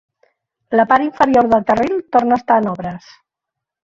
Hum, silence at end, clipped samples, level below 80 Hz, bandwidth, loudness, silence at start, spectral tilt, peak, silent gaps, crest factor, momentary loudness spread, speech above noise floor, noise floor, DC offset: none; 1 s; under 0.1%; -52 dBFS; 7.6 kHz; -15 LUFS; 0.7 s; -7 dB/octave; -2 dBFS; none; 16 dB; 11 LU; 68 dB; -82 dBFS; under 0.1%